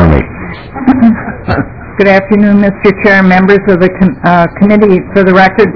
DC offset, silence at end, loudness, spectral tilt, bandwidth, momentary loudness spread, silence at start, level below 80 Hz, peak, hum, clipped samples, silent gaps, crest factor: 1%; 0 s; -7 LUFS; -9 dB/octave; 5.4 kHz; 9 LU; 0 s; -26 dBFS; 0 dBFS; none; 8%; none; 8 dB